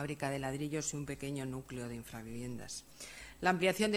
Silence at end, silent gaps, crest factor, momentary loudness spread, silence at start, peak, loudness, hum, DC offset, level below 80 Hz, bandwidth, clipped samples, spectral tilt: 0 s; none; 24 dB; 15 LU; 0 s; -14 dBFS; -38 LUFS; none; under 0.1%; -60 dBFS; over 20 kHz; under 0.1%; -4.5 dB/octave